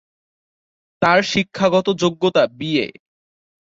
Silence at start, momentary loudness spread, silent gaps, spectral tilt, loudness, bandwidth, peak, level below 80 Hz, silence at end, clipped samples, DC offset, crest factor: 1 s; 5 LU; none; -5 dB/octave; -18 LUFS; 7.8 kHz; -2 dBFS; -58 dBFS; 0.9 s; under 0.1%; under 0.1%; 18 dB